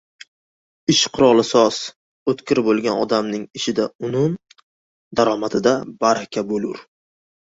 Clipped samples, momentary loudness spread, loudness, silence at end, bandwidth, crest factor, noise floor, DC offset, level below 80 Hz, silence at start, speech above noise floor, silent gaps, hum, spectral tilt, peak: under 0.1%; 12 LU; -19 LUFS; 0.8 s; 8 kHz; 18 dB; under -90 dBFS; under 0.1%; -58 dBFS; 0.9 s; over 72 dB; 1.96-2.26 s, 3.95-3.99 s, 4.63-5.11 s; none; -4.5 dB/octave; -2 dBFS